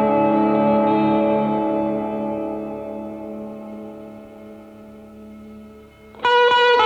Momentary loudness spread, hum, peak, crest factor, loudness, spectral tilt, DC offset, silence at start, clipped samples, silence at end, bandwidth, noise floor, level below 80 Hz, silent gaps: 24 LU; none; -4 dBFS; 16 dB; -19 LUFS; -6 dB/octave; under 0.1%; 0 s; under 0.1%; 0 s; 7.8 kHz; -43 dBFS; -54 dBFS; none